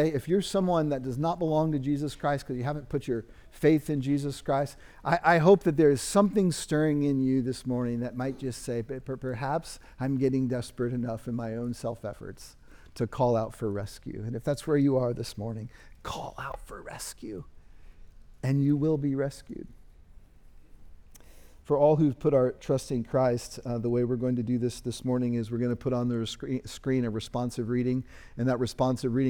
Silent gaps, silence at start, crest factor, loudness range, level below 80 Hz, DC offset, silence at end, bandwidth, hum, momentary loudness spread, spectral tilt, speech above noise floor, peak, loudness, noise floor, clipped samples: none; 0 s; 20 dB; 8 LU; -52 dBFS; under 0.1%; 0 s; 19.5 kHz; none; 14 LU; -6.5 dB/octave; 24 dB; -8 dBFS; -28 LUFS; -52 dBFS; under 0.1%